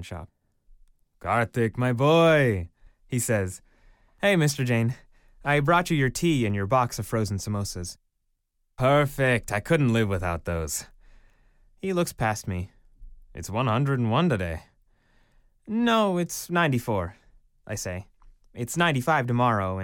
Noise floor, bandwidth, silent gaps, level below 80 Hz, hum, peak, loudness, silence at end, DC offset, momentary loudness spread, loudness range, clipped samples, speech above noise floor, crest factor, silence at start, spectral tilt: -74 dBFS; 17 kHz; none; -48 dBFS; none; -8 dBFS; -25 LUFS; 0 s; under 0.1%; 14 LU; 4 LU; under 0.1%; 50 dB; 18 dB; 0 s; -5.5 dB/octave